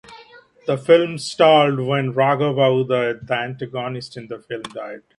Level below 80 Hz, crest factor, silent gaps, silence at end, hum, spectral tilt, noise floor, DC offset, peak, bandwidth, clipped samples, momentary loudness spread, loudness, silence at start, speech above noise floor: -62 dBFS; 18 dB; none; 0.2 s; none; -6 dB/octave; -47 dBFS; under 0.1%; 0 dBFS; 11.5 kHz; under 0.1%; 17 LU; -18 LUFS; 0.1 s; 28 dB